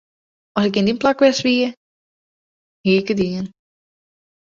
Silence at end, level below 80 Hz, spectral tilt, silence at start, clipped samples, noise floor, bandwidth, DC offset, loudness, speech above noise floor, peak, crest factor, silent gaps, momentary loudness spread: 0.95 s; -56 dBFS; -5.5 dB/octave; 0.55 s; under 0.1%; under -90 dBFS; 7.6 kHz; under 0.1%; -18 LUFS; over 73 dB; -2 dBFS; 18 dB; 1.77-2.84 s; 11 LU